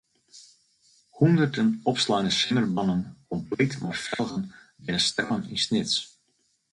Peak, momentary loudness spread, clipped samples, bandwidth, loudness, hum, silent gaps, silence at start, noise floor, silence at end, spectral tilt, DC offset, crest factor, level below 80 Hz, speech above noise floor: -8 dBFS; 12 LU; under 0.1%; 11 kHz; -25 LUFS; none; none; 0.35 s; -71 dBFS; 0.65 s; -4.5 dB/octave; under 0.1%; 18 dB; -60 dBFS; 46 dB